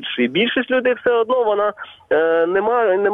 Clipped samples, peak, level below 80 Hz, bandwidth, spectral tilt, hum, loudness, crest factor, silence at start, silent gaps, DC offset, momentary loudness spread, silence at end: under 0.1%; -6 dBFS; -60 dBFS; 3.9 kHz; -7 dB/octave; none; -18 LUFS; 10 dB; 0 s; none; under 0.1%; 4 LU; 0 s